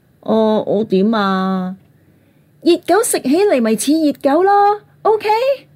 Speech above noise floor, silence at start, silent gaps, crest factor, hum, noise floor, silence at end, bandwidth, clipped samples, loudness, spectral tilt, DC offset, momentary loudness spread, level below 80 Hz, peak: 38 dB; 0.25 s; none; 12 dB; none; -52 dBFS; 0.15 s; 16 kHz; under 0.1%; -15 LUFS; -5 dB/octave; under 0.1%; 6 LU; -66 dBFS; -2 dBFS